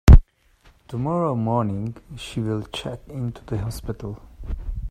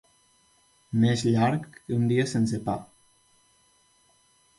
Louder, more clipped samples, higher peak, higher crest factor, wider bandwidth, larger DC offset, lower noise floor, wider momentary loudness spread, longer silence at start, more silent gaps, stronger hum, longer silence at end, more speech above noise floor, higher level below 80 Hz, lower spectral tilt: about the same, -25 LUFS vs -26 LUFS; neither; first, 0 dBFS vs -12 dBFS; about the same, 20 dB vs 18 dB; first, 14 kHz vs 11.5 kHz; neither; second, -56 dBFS vs -64 dBFS; first, 13 LU vs 10 LU; second, 0.05 s vs 0.9 s; neither; neither; second, 0 s vs 1.75 s; second, 30 dB vs 39 dB; first, -22 dBFS vs -60 dBFS; about the same, -7.5 dB/octave vs -6.5 dB/octave